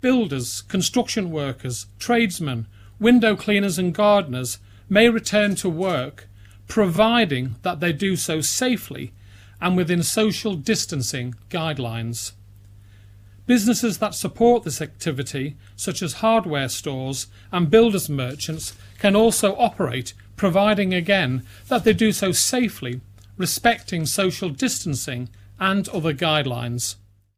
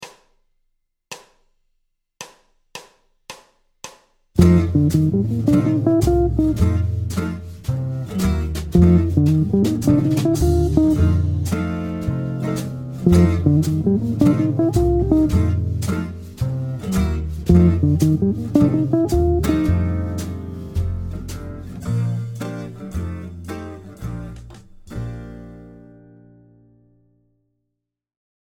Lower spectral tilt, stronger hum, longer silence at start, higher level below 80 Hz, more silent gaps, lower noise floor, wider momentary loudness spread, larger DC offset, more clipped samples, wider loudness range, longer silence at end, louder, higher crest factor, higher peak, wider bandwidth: second, -4.5 dB/octave vs -8 dB/octave; neither; about the same, 0.05 s vs 0 s; second, -50 dBFS vs -30 dBFS; neither; second, -46 dBFS vs -78 dBFS; second, 13 LU vs 21 LU; neither; neither; second, 4 LU vs 15 LU; second, 0.45 s vs 2.6 s; about the same, -21 LUFS vs -19 LUFS; about the same, 22 dB vs 20 dB; about the same, 0 dBFS vs 0 dBFS; about the same, 16.5 kHz vs 17 kHz